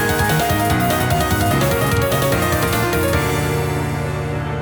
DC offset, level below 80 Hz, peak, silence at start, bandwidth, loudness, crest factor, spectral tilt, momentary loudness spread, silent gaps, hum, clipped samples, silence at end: under 0.1%; -32 dBFS; -4 dBFS; 0 s; over 20 kHz; -18 LUFS; 14 dB; -5 dB/octave; 5 LU; none; none; under 0.1%; 0 s